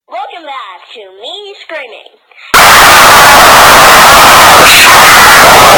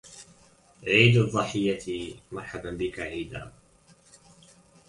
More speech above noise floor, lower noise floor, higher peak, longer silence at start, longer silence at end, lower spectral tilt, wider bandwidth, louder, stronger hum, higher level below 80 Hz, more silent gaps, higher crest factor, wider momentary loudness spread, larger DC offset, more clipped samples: second, -1 dB vs 33 dB; second, -24 dBFS vs -59 dBFS; first, 0 dBFS vs -4 dBFS; about the same, 0.1 s vs 0.05 s; second, 0 s vs 1.4 s; second, -1 dB/octave vs -5.5 dB/octave; first, over 20 kHz vs 11.5 kHz; first, 0 LUFS vs -25 LUFS; neither; first, -28 dBFS vs -54 dBFS; neither; second, 4 dB vs 24 dB; about the same, 23 LU vs 22 LU; neither; first, 30% vs under 0.1%